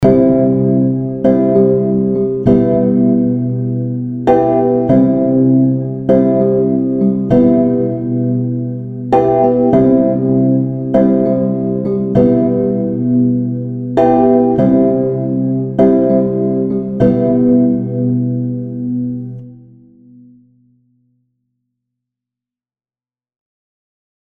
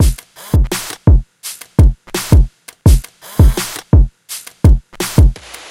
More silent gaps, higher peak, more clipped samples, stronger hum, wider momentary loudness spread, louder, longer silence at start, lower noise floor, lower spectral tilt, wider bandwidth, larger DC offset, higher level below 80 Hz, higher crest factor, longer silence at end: neither; about the same, 0 dBFS vs 0 dBFS; neither; neither; second, 7 LU vs 14 LU; about the same, -13 LUFS vs -14 LUFS; about the same, 0 s vs 0 s; first, under -90 dBFS vs -32 dBFS; first, -11.5 dB/octave vs -6 dB/octave; second, 3.8 kHz vs 16.5 kHz; neither; second, -42 dBFS vs -14 dBFS; about the same, 12 dB vs 12 dB; first, 4.75 s vs 0.4 s